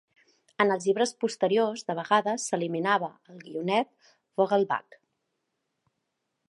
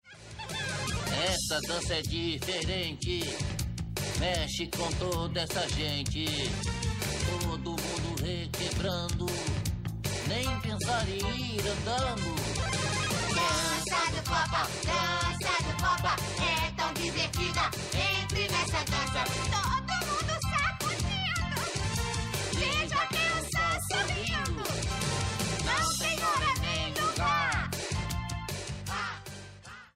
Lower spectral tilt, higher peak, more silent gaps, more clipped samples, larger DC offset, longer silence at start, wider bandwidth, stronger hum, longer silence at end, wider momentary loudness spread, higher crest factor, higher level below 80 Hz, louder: about the same, -4 dB/octave vs -3.5 dB/octave; first, -6 dBFS vs -16 dBFS; neither; neither; neither; first, 0.6 s vs 0.05 s; second, 11.5 kHz vs 16 kHz; neither; first, 1.65 s vs 0.05 s; first, 9 LU vs 6 LU; first, 22 dB vs 16 dB; second, -84 dBFS vs -42 dBFS; first, -27 LUFS vs -30 LUFS